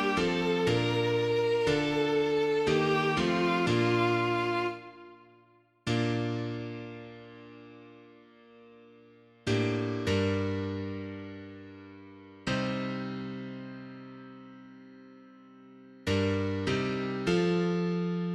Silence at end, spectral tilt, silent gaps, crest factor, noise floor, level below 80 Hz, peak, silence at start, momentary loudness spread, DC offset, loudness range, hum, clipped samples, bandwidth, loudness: 0 s; -6 dB/octave; none; 18 dB; -63 dBFS; -58 dBFS; -14 dBFS; 0 s; 22 LU; under 0.1%; 11 LU; none; under 0.1%; 12.5 kHz; -29 LUFS